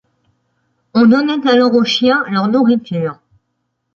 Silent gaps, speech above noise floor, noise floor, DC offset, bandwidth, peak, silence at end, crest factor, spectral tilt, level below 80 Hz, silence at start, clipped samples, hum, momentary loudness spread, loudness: none; 58 dB; -70 dBFS; under 0.1%; 7.2 kHz; -2 dBFS; 0.8 s; 14 dB; -6 dB/octave; -60 dBFS; 0.95 s; under 0.1%; none; 9 LU; -13 LUFS